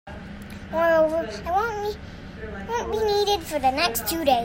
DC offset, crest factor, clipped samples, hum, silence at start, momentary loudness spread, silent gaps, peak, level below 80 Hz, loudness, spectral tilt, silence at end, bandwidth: under 0.1%; 18 dB; under 0.1%; none; 0.05 s; 18 LU; none; -8 dBFS; -44 dBFS; -24 LUFS; -3.5 dB/octave; 0 s; 16.5 kHz